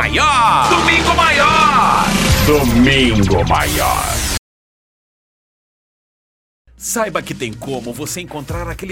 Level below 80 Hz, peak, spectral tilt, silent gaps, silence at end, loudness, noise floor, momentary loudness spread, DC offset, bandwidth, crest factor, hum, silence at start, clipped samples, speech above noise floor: -28 dBFS; 0 dBFS; -4 dB/octave; 4.38-6.65 s; 0 s; -13 LUFS; under -90 dBFS; 14 LU; under 0.1%; 16.5 kHz; 14 dB; none; 0 s; under 0.1%; over 75 dB